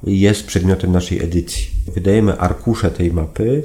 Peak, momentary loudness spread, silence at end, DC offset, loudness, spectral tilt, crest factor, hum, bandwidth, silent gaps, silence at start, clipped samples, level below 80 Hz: 0 dBFS; 6 LU; 0 s; under 0.1%; -17 LUFS; -6.5 dB/octave; 16 dB; none; 15.5 kHz; none; 0 s; under 0.1%; -28 dBFS